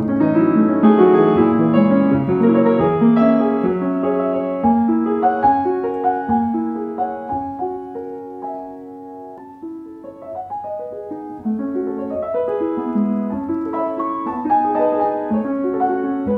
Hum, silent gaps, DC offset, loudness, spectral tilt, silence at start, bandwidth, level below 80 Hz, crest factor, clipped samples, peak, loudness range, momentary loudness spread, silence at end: none; none; under 0.1%; -18 LUFS; -10.5 dB/octave; 0 s; 4.3 kHz; -52 dBFS; 16 dB; under 0.1%; -2 dBFS; 15 LU; 17 LU; 0 s